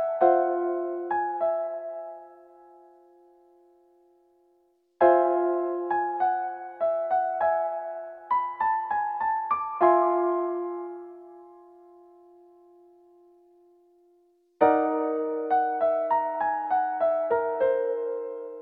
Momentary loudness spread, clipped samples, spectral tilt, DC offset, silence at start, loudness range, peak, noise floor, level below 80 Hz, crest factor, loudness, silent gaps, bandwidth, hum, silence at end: 13 LU; under 0.1%; -8.5 dB/octave; under 0.1%; 0 s; 9 LU; -8 dBFS; -67 dBFS; -72 dBFS; 20 dB; -26 LUFS; none; 4 kHz; none; 0 s